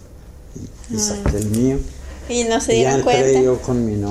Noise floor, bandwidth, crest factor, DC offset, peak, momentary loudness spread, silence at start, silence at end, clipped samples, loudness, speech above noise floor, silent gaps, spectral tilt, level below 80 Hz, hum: -39 dBFS; 14.5 kHz; 16 dB; under 0.1%; -2 dBFS; 20 LU; 0.05 s; 0 s; under 0.1%; -18 LUFS; 21 dB; none; -5 dB/octave; -32 dBFS; none